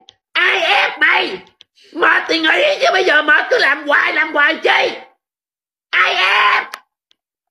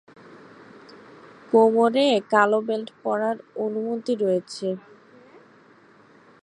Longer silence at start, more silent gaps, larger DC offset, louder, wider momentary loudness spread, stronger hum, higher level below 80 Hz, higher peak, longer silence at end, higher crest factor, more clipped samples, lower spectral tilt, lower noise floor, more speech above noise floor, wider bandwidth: second, 0.35 s vs 0.9 s; neither; neither; first, -13 LUFS vs -22 LUFS; about the same, 9 LU vs 11 LU; neither; first, -70 dBFS vs -78 dBFS; first, 0 dBFS vs -4 dBFS; second, 0.7 s vs 1.65 s; second, 14 dB vs 20 dB; neither; second, -1 dB/octave vs -5.5 dB/octave; first, under -90 dBFS vs -53 dBFS; first, over 76 dB vs 32 dB; first, 14 kHz vs 10.5 kHz